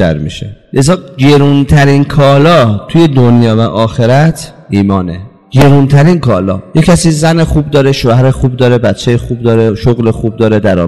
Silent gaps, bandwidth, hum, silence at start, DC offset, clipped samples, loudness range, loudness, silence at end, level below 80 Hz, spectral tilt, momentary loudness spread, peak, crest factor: none; 12.5 kHz; none; 0 s; 2%; 0.4%; 2 LU; -8 LUFS; 0 s; -28 dBFS; -7 dB/octave; 7 LU; 0 dBFS; 8 dB